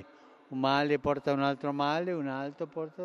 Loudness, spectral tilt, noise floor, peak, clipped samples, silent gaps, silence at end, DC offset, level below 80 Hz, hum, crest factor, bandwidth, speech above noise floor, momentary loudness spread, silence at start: -31 LUFS; -6.5 dB/octave; -56 dBFS; -12 dBFS; under 0.1%; none; 0 s; under 0.1%; -64 dBFS; none; 18 dB; 6.8 kHz; 25 dB; 10 LU; 0 s